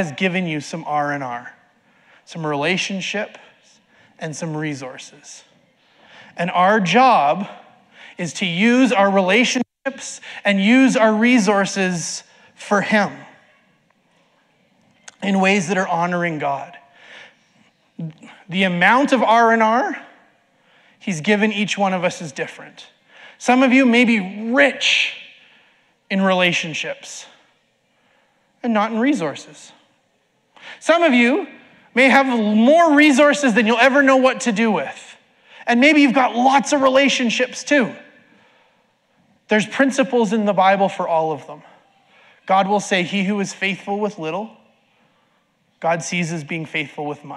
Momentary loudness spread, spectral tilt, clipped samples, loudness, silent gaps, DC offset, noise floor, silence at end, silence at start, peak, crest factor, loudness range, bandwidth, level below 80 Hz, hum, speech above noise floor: 17 LU; -4.5 dB/octave; under 0.1%; -17 LUFS; none; under 0.1%; -64 dBFS; 0 s; 0 s; -2 dBFS; 18 dB; 10 LU; 11.5 kHz; -72 dBFS; none; 47 dB